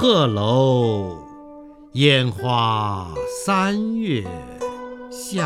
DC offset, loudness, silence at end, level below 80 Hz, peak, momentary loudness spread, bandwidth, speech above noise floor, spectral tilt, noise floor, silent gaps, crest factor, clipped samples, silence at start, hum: under 0.1%; -20 LUFS; 0 s; -50 dBFS; 0 dBFS; 17 LU; 14.5 kHz; 22 dB; -5.5 dB/octave; -41 dBFS; none; 20 dB; under 0.1%; 0 s; none